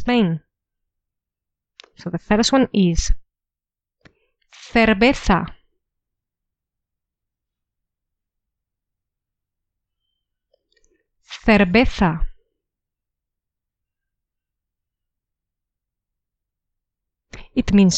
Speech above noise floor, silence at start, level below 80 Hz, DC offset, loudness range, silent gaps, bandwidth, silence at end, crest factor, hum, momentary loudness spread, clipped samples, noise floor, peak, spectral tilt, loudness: 72 dB; 0 s; -34 dBFS; under 0.1%; 8 LU; none; 9 kHz; 0 s; 20 dB; none; 16 LU; under 0.1%; -88 dBFS; -4 dBFS; -5 dB/octave; -18 LUFS